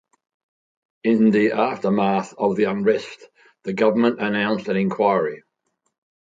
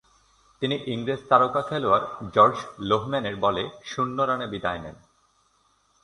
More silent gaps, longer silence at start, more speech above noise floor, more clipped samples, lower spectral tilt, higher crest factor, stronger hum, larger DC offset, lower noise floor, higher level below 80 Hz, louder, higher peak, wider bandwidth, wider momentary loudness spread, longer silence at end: neither; first, 1.05 s vs 0.6 s; first, 54 dB vs 41 dB; neither; about the same, -7 dB/octave vs -6 dB/octave; about the same, 18 dB vs 22 dB; neither; neither; first, -73 dBFS vs -65 dBFS; second, -66 dBFS vs -56 dBFS; first, -20 LUFS vs -24 LUFS; about the same, -4 dBFS vs -4 dBFS; second, 7.8 kHz vs 11 kHz; about the same, 10 LU vs 11 LU; second, 0.9 s vs 1.1 s